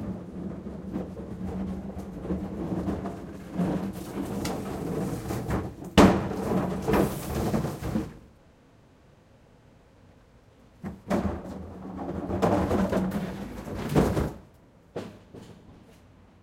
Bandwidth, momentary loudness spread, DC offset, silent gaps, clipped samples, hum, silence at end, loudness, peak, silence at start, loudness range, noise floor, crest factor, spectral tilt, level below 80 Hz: 16.5 kHz; 16 LU; under 0.1%; none; under 0.1%; none; 0.5 s; -29 LUFS; -2 dBFS; 0 s; 11 LU; -57 dBFS; 28 dB; -6.5 dB/octave; -44 dBFS